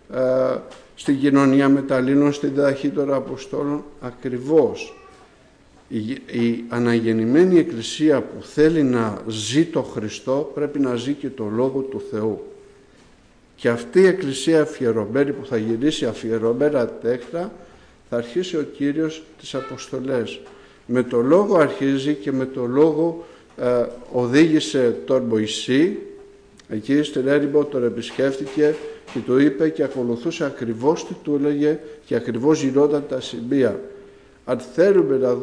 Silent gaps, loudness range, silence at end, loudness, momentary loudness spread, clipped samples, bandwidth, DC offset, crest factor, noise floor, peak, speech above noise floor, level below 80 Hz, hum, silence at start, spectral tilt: none; 6 LU; 0 s; -21 LUFS; 12 LU; under 0.1%; 10.5 kHz; under 0.1%; 16 dB; -52 dBFS; -6 dBFS; 32 dB; -56 dBFS; none; 0.1 s; -6 dB/octave